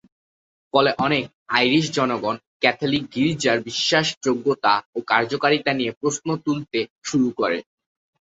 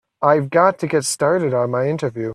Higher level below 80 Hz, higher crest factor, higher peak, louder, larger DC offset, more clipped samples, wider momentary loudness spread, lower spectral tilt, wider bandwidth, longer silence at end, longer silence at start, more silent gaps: about the same, -60 dBFS vs -62 dBFS; about the same, 20 dB vs 16 dB; about the same, -2 dBFS vs -2 dBFS; second, -21 LUFS vs -18 LUFS; neither; neither; about the same, 6 LU vs 5 LU; about the same, -4 dB/octave vs -5 dB/octave; second, 8 kHz vs 14 kHz; first, 0.75 s vs 0 s; first, 0.75 s vs 0.2 s; first, 1.35-1.46 s, 2.47-2.60 s, 4.17-4.21 s, 4.85-4.93 s, 5.97-6.01 s, 6.90-6.99 s vs none